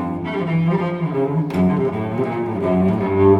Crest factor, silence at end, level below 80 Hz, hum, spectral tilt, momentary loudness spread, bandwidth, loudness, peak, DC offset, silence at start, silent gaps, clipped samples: 14 dB; 0 s; -50 dBFS; none; -9.5 dB/octave; 4 LU; 5.8 kHz; -20 LUFS; -4 dBFS; under 0.1%; 0 s; none; under 0.1%